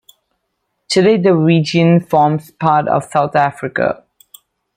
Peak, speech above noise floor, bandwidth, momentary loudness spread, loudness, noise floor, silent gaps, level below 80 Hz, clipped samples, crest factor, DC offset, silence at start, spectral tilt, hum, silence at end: 0 dBFS; 57 dB; 16 kHz; 7 LU; -14 LUFS; -71 dBFS; none; -58 dBFS; under 0.1%; 14 dB; under 0.1%; 0.9 s; -6.5 dB/octave; none; 0.8 s